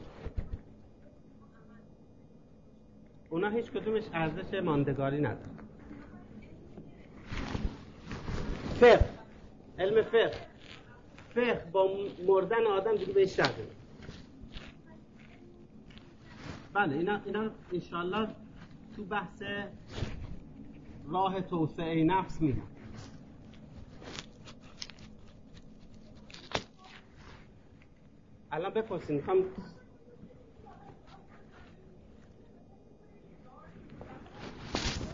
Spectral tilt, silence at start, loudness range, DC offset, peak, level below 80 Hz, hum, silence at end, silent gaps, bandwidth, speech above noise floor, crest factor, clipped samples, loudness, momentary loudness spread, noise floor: -6 dB/octave; 0 s; 18 LU; under 0.1%; -8 dBFS; -48 dBFS; none; 0 s; none; 7.6 kHz; 28 dB; 26 dB; under 0.1%; -32 LUFS; 25 LU; -58 dBFS